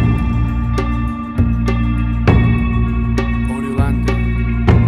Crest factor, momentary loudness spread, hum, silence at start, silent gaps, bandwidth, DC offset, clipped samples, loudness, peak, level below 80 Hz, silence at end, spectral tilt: 14 dB; 6 LU; none; 0 s; none; 10.5 kHz; under 0.1%; under 0.1%; -17 LUFS; 0 dBFS; -20 dBFS; 0 s; -8.5 dB/octave